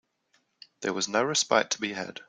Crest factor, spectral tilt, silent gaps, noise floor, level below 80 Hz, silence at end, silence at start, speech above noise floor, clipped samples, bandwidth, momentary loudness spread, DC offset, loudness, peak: 24 dB; -2 dB/octave; none; -71 dBFS; -74 dBFS; 0.1 s; 0.8 s; 43 dB; under 0.1%; 10 kHz; 9 LU; under 0.1%; -27 LUFS; -6 dBFS